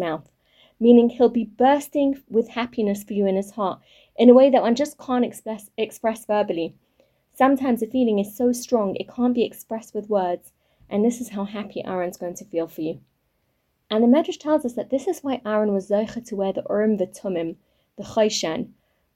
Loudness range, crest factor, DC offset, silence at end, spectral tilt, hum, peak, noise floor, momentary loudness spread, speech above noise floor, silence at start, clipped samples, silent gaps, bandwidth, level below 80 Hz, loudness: 7 LU; 20 dB; under 0.1%; 0.5 s; -5.5 dB/octave; none; -2 dBFS; -70 dBFS; 14 LU; 49 dB; 0 s; under 0.1%; none; 16 kHz; -62 dBFS; -22 LUFS